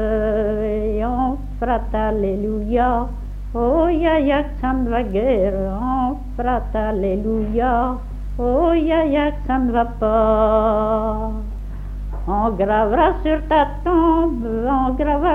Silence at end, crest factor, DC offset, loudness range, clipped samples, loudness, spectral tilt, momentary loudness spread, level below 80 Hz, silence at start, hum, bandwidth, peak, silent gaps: 0 s; 14 dB; under 0.1%; 3 LU; under 0.1%; -19 LUFS; -9 dB/octave; 8 LU; -26 dBFS; 0 s; 50 Hz at -40 dBFS; 4.1 kHz; -4 dBFS; none